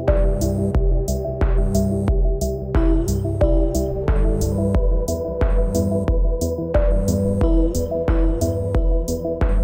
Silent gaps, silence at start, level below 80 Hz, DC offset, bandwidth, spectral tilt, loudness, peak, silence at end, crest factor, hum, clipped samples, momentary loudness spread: none; 0 s; -20 dBFS; under 0.1%; 16.5 kHz; -7.5 dB/octave; -21 LUFS; -6 dBFS; 0 s; 12 dB; none; under 0.1%; 3 LU